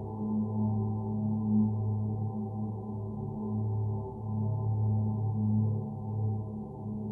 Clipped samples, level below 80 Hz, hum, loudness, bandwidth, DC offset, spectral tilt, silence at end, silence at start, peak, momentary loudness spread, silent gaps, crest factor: under 0.1%; -54 dBFS; none; -32 LUFS; 1.2 kHz; under 0.1%; -14.5 dB/octave; 0 s; 0 s; -18 dBFS; 8 LU; none; 12 dB